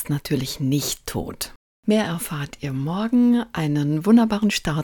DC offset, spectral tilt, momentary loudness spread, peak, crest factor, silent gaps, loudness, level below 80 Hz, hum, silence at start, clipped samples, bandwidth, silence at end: under 0.1%; -5.5 dB/octave; 13 LU; -6 dBFS; 16 dB; 1.56-1.83 s; -22 LUFS; -48 dBFS; none; 0 s; under 0.1%; 18 kHz; 0 s